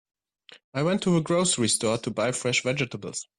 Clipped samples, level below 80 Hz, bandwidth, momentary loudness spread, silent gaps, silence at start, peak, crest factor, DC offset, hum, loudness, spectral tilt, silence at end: under 0.1%; -62 dBFS; 12.5 kHz; 7 LU; 0.64-0.73 s; 0.5 s; -12 dBFS; 16 dB; under 0.1%; none; -25 LUFS; -4 dB/octave; 0.15 s